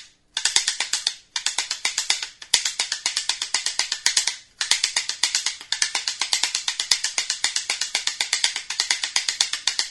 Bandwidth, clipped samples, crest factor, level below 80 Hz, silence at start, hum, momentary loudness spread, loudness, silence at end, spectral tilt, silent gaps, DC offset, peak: 12 kHz; under 0.1%; 26 dB; -62 dBFS; 0 s; none; 4 LU; -22 LUFS; 0 s; 3.5 dB/octave; none; under 0.1%; 0 dBFS